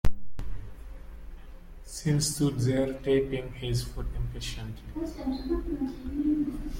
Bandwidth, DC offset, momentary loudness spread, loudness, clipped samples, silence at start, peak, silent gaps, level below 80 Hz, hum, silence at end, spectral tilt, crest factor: 16.5 kHz; under 0.1%; 21 LU; -30 LUFS; under 0.1%; 0.05 s; -10 dBFS; none; -38 dBFS; none; 0 s; -5.5 dB/octave; 18 dB